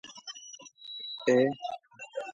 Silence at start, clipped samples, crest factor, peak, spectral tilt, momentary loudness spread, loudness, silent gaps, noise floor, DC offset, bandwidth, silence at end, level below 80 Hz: 0.05 s; under 0.1%; 20 dB; -12 dBFS; -4.5 dB/octave; 19 LU; -30 LUFS; none; -50 dBFS; under 0.1%; 7.6 kHz; 0 s; -80 dBFS